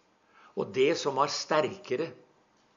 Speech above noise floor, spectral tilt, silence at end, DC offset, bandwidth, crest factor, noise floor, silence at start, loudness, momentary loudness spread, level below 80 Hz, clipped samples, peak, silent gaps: 37 dB; -4 dB/octave; 0.6 s; under 0.1%; 7.6 kHz; 20 dB; -65 dBFS; 0.55 s; -29 LUFS; 11 LU; -82 dBFS; under 0.1%; -12 dBFS; none